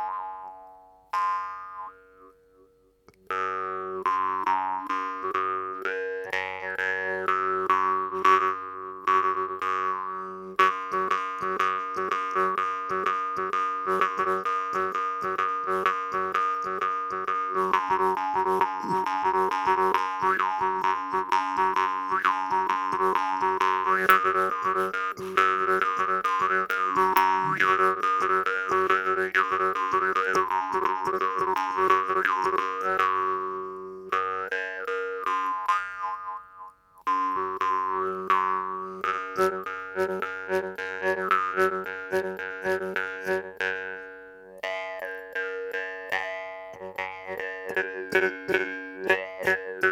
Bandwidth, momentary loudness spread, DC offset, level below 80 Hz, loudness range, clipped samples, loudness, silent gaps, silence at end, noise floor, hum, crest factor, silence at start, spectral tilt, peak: 19.5 kHz; 10 LU; under 0.1%; -70 dBFS; 7 LU; under 0.1%; -26 LUFS; none; 0 s; -60 dBFS; none; 24 dB; 0 s; -4 dB/octave; -2 dBFS